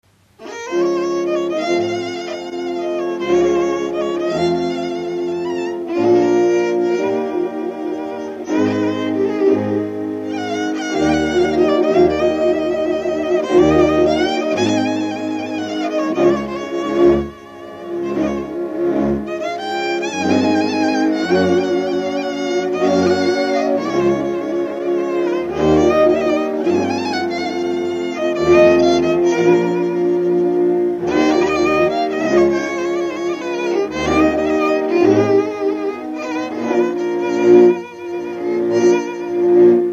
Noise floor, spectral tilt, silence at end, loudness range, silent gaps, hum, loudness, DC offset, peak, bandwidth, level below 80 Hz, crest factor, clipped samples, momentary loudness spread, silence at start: -37 dBFS; -6 dB/octave; 0 s; 4 LU; none; none; -17 LUFS; under 0.1%; 0 dBFS; 8 kHz; -46 dBFS; 16 dB; under 0.1%; 9 LU; 0.4 s